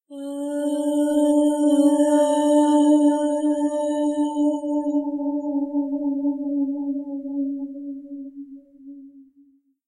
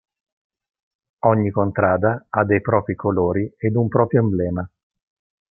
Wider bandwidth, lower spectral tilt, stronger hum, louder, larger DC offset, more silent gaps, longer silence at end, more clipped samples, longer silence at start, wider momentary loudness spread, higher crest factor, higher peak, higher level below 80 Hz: first, 12.5 kHz vs 2.8 kHz; second, -4 dB/octave vs -14.5 dB/octave; neither; about the same, -21 LUFS vs -20 LUFS; neither; neither; second, 0.65 s vs 0.9 s; neither; second, 0.1 s vs 1.25 s; first, 16 LU vs 5 LU; about the same, 16 dB vs 20 dB; second, -6 dBFS vs -2 dBFS; second, -70 dBFS vs -56 dBFS